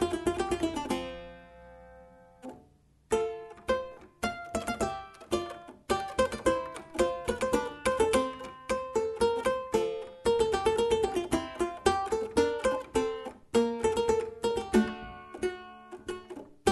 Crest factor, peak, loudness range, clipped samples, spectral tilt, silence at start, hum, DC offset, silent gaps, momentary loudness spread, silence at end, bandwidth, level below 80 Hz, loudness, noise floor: 20 dB; -10 dBFS; 7 LU; under 0.1%; -4.5 dB/octave; 0 s; none; under 0.1%; none; 15 LU; 0 s; 12 kHz; -50 dBFS; -31 LUFS; -62 dBFS